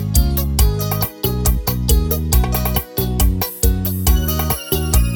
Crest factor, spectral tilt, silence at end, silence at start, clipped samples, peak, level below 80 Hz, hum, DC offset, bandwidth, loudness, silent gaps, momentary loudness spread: 14 dB; -5 dB/octave; 0 s; 0 s; under 0.1%; -2 dBFS; -18 dBFS; none; under 0.1%; over 20 kHz; -18 LUFS; none; 3 LU